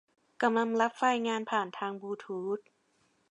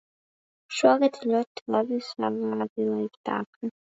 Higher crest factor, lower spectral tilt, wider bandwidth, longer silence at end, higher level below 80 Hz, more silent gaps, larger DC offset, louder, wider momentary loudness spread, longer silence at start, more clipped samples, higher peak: about the same, 20 dB vs 22 dB; about the same, -4.5 dB/octave vs -5 dB/octave; first, 10.5 kHz vs 8 kHz; first, 0.7 s vs 0.15 s; second, -88 dBFS vs -78 dBFS; second, none vs 1.47-1.55 s, 1.61-1.66 s, 2.70-2.76 s, 3.17-3.24 s, 3.46-3.61 s; neither; second, -31 LUFS vs -27 LUFS; about the same, 10 LU vs 10 LU; second, 0.4 s vs 0.7 s; neither; second, -12 dBFS vs -6 dBFS